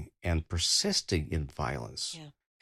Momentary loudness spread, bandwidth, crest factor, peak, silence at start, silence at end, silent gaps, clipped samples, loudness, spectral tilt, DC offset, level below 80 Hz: 10 LU; 14.5 kHz; 18 dB; -14 dBFS; 0 s; 0.3 s; none; under 0.1%; -30 LUFS; -3.5 dB/octave; under 0.1%; -46 dBFS